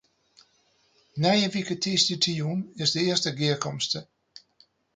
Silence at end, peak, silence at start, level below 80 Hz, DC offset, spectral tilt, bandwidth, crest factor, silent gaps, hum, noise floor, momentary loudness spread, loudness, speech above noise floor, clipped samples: 0.9 s; -8 dBFS; 1.15 s; -68 dBFS; under 0.1%; -4 dB/octave; 9.6 kHz; 20 dB; none; none; -66 dBFS; 7 LU; -25 LUFS; 40 dB; under 0.1%